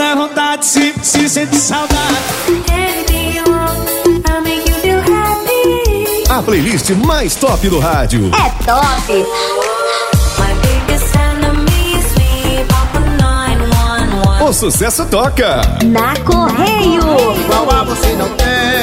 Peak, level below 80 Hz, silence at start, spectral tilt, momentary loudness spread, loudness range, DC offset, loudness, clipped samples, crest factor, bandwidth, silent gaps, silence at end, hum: 0 dBFS; -18 dBFS; 0 s; -4.5 dB/octave; 3 LU; 2 LU; under 0.1%; -12 LUFS; under 0.1%; 12 dB; 16.5 kHz; none; 0 s; none